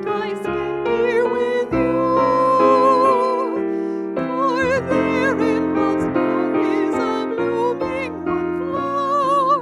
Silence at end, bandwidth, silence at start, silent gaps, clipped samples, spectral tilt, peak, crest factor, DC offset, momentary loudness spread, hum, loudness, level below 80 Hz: 0 s; 11.5 kHz; 0 s; none; under 0.1%; -6.5 dB/octave; -2 dBFS; 16 dB; under 0.1%; 9 LU; none; -19 LUFS; -50 dBFS